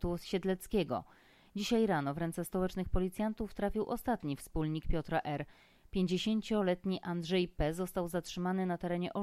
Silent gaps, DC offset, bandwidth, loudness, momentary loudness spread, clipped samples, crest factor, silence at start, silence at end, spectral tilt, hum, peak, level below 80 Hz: none; under 0.1%; 15 kHz; -36 LUFS; 6 LU; under 0.1%; 16 dB; 0 s; 0 s; -6 dB/octave; none; -20 dBFS; -46 dBFS